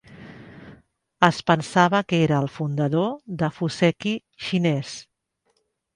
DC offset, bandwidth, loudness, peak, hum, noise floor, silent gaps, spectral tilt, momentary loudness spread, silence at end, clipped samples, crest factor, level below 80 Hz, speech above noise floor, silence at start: under 0.1%; 11 kHz; -22 LUFS; 0 dBFS; none; -71 dBFS; none; -6 dB/octave; 15 LU; 0.95 s; under 0.1%; 24 dB; -60 dBFS; 49 dB; 0.1 s